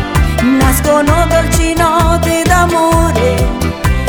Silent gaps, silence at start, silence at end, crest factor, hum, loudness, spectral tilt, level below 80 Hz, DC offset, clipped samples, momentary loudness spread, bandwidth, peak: none; 0 s; 0 s; 10 dB; none; -11 LUFS; -5.5 dB/octave; -18 dBFS; under 0.1%; under 0.1%; 4 LU; over 20 kHz; 0 dBFS